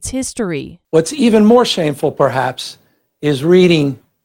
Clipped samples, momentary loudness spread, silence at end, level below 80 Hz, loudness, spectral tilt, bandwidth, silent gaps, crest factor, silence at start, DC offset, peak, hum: under 0.1%; 12 LU; 0.3 s; -46 dBFS; -14 LUFS; -5.5 dB/octave; 16.5 kHz; none; 14 dB; 0 s; under 0.1%; 0 dBFS; none